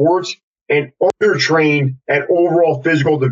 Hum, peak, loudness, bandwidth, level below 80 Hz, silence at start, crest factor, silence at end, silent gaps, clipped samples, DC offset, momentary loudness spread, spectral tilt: none; -2 dBFS; -15 LUFS; 8.2 kHz; -60 dBFS; 0 s; 12 dB; 0 s; 0.43-0.54 s, 0.61-0.66 s; under 0.1%; under 0.1%; 6 LU; -6 dB/octave